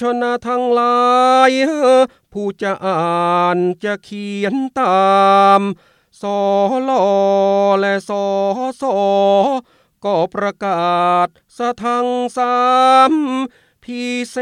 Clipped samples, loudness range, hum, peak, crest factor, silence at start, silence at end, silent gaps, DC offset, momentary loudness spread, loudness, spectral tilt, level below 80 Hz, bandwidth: under 0.1%; 3 LU; none; 0 dBFS; 16 dB; 0 s; 0 s; none; under 0.1%; 12 LU; -15 LUFS; -5.5 dB/octave; -64 dBFS; 11.5 kHz